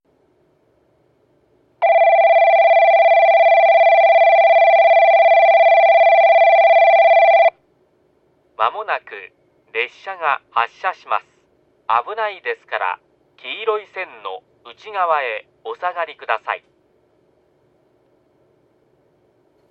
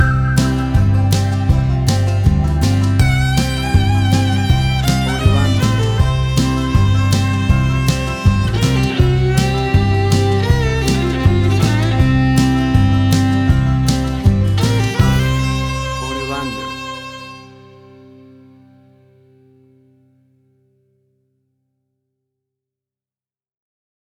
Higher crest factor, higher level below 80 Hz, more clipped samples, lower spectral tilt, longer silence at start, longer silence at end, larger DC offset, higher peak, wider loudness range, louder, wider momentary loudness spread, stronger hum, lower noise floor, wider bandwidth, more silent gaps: about the same, 14 dB vs 14 dB; second, -66 dBFS vs -24 dBFS; neither; second, -2.5 dB/octave vs -6 dB/octave; first, 1.8 s vs 0 s; second, 3.15 s vs 6.7 s; neither; about the same, -2 dBFS vs -2 dBFS; first, 14 LU vs 8 LU; about the same, -14 LUFS vs -15 LUFS; first, 18 LU vs 6 LU; neither; second, -60 dBFS vs under -90 dBFS; second, 5.8 kHz vs 16.5 kHz; neither